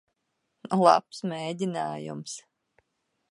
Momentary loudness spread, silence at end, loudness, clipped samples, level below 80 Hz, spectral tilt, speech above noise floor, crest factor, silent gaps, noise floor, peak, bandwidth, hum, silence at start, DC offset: 17 LU; 0.9 s; -27 LUFS; under 0.1%; -78 dBFS; -5.5 dB/octave; 52 dB; 26 dB; none; -79 dBFS; -4 dBFS; 11.5 kHz; none; 0.65 s; under 0.1%